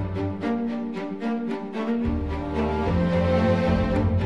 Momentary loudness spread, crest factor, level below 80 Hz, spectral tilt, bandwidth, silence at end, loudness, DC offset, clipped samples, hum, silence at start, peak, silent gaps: 8 LU; 14 dB; -36 dBFS; -8.5 dB/octave; 8 kHz; 0 s; -25 LUFS; 0.4%; under 0.1%; none; 0 s; -10 dBFS; none